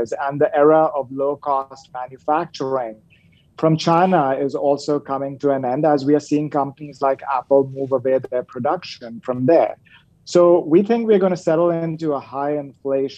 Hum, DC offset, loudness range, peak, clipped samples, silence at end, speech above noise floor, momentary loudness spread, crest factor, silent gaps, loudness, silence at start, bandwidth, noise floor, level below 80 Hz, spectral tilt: none; under 0.1%; 3 LU; -2 dBFS; under 0.1%; 0 s; 35 dB; 10 LU; 16 dB; none; -19 LUFS; 0 s; 8.8 kHz; -54 dBFS; -66 dBFS; -7 dB/octave